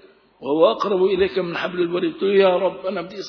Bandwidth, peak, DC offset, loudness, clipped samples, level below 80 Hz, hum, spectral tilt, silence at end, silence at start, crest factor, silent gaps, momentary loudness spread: 5.4 kHz; -4 dBFS; under 0.1%; -20 LUFS; under 0.1%; -56 dBFS; none; -6.5 dB/octave; 0 s; 0.4 s; 16 dB; none; 9 LU